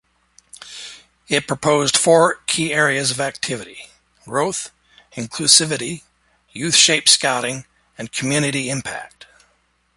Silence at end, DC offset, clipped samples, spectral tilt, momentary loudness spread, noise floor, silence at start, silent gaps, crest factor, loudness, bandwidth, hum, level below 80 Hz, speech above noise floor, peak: 0.9 s; under 0.1%; under 0.1%; -2 dB/octave; 22 LU; -63 dBFS; 0.6 s; none; 20 dB; -17 LUFS; 16 kHz; none; -58 dBFS; 44 dB; 0 dBFS